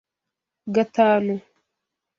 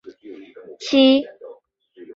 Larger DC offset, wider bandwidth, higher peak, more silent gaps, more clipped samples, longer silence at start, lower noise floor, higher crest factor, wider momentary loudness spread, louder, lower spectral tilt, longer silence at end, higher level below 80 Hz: neither; about the same, 7.2 kHz vs 7.4 kHz; about the same, -4 dBFS vs -2 dBFS; neither; neither; first, 0.65 s vs 0.05 s; first, -85 dBFS vs -49 dBFS; about the same, 20 dB vs 18 dB; second, 14 LU vs 26 LU; second, -21 LUFS vs -16 LUFS; first, -7 dB/octave vs -3.5 dB/octave; first, 0.8 s vs 0.1 s; about the same, -70 dBFS vs -66 dBFS